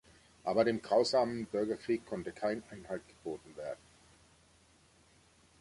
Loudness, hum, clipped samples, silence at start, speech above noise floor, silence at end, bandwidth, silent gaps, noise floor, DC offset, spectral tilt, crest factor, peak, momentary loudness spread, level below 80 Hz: -35 LUFS; none; under 0.1%; 0.45 s; 31 dB; 1.85 s; 11.5 kHz; none; -66 dBFS; under 0.1%; -5 dB/octave; 20 dB; -16 dBFS; 15 LU; -68 dBFS